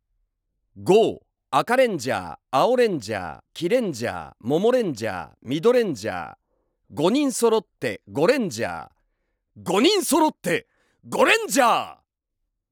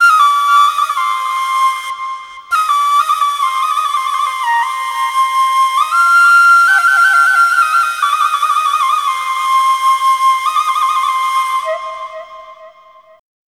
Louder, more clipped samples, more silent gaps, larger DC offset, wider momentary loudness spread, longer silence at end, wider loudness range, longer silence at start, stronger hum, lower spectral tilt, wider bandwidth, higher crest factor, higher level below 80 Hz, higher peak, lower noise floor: second, -22 LUFS vs -12 LUFS; neither; neither; neither; first, 13 LU vs 10 LU; about the same, 0.8 s vs 0.8 s; about the same, 3 LU vs 5 LU; first, 0.75 s vs 0 s; neither; first, -4 dB/octave vs 3.5 dB/octave; first, over 20 kHz vs 18 kHz; first, 18 dB vs 12 dB; about the same, -66 dBFS vs -64 dBFS; second, -4 dBFS vs 0 dBFS; first, -79 dBFS vs -43 dBFS